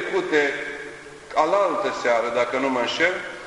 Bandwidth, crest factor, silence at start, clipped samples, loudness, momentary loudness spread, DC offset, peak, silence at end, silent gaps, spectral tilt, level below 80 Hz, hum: 11 kHz; 18 dB; 0 s; under 0.1%; -22 LUFS; 12 LU; under 0.1%; -4 dBFS; 0 s; none; -3.5 dB/octave; -60 dBFS; none